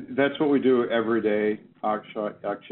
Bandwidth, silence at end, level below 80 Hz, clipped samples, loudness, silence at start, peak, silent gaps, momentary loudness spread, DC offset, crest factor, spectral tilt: 4.2 kHz; 0 s; -70 dBFS; under 0.1%; -25 LUFS; 0 s; -8 dBFS; none; 9 LU; under 0.1%; 16 dB; -4.5 dB/octave